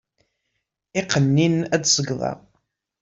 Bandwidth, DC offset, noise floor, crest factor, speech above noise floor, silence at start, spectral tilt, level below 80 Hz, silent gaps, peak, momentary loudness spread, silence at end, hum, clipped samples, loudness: 7.8 kHz; under 0.1%; -77 dBFS; 22 dB; 57 dB; 0.95 s; -4 dB/octave; -58 dBFS; none; -2 dBFS; 11 LU; 0.65 s; none; under 0.1%; -21 LUFS